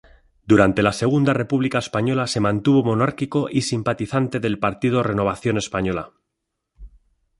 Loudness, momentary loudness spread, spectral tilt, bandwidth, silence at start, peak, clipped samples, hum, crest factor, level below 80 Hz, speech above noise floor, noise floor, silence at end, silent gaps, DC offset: -20 LUFS; 6 LU; -6 dB/octave; 11.5 kHz; 0.45 s; -2 dBFS; under 0.1%; none; 18 dB; -48 dBFS; 59 dB; -79 dBFS; 0.5 s; none; under 0.1%